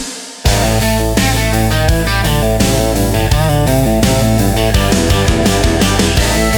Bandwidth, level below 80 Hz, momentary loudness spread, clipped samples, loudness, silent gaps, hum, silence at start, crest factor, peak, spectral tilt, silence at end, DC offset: 19 kHz; -18 dBFS; 2 LU; under 0.1%; -12 LUFS; none; none; 0 s; 12 dB; 0 dBFS; -4.5 dB/octave; 0 s; under 0.1%